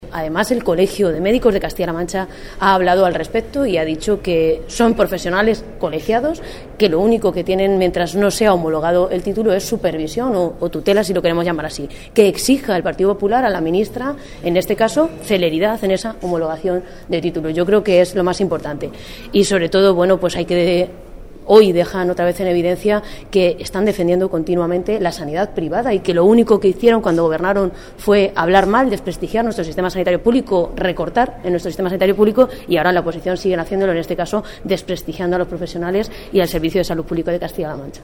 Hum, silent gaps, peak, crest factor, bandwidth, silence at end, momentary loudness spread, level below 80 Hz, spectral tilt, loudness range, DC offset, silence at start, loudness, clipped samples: none; none; 0 dBFS; 16 dB; 16.5 kHz; 0 s; 9 LU; -36 dBFS; -5.5 dB/octave; 3 LU; under 0.1%; 0 s; -17 LUFS; under 0.1%